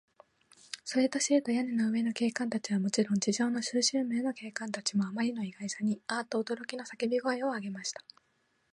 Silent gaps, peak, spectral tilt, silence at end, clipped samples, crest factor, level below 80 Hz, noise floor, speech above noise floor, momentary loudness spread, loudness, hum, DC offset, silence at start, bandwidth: none; -12 dBFS; -4 dB/octave; 0.75 s; under 0.1%; 20 dB; -80 dBFS; -74 dBFS; 43 dB; 9 LU; -32 LUFS; none; under 0.1%; 0.75 s; 11.5 kHz